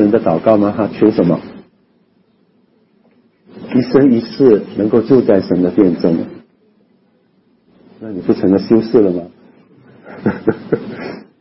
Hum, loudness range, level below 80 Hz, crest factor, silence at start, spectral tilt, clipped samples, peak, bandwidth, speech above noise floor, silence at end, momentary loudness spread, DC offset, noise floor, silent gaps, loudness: none; 5 LU; -52 dBFS; 16 dB; 0 s; -11.5 dB/octave; under 0.1%; 0 dBFS; 5.8 kHz; 43 dB; 0.2 s; 17 LU; under 0.1%; -56 dBFS; none; -13 LUFS